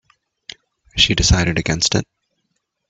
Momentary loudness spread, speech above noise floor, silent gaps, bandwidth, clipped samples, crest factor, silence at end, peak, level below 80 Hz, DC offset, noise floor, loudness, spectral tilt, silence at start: 24 LU; 56 dB; none; 8.4 kHz; under 0.1%; 20 dB; 0.85 s; 0 dBFS; -30 dBFS; under 0.1%; -72 dBFS; -16 LUFS; -3 dB/octave; 0.95 s